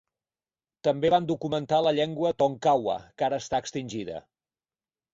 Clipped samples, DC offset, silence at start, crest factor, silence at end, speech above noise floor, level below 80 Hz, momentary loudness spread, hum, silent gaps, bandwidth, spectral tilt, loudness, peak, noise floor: under 0.1%; under 0.1%; 0.85 s; 18 dB; 0.95 s; over 64 dB; -62 dBFS; 11 LU; none; none; 7.8 kHz; -5.5 dB/octave; -27 LUFS; -10 dBFS; under -90 dBFS